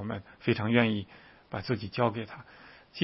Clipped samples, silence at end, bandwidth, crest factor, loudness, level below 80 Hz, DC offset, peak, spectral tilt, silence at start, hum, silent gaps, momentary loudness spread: under 0.1%; 0 s; 5.8 kHz; 24 dB; -30 LUFS; -64 dBFS; under 0.1%; -8 dBFS; -10 dB/octave; 0 s; none; none; 22 LU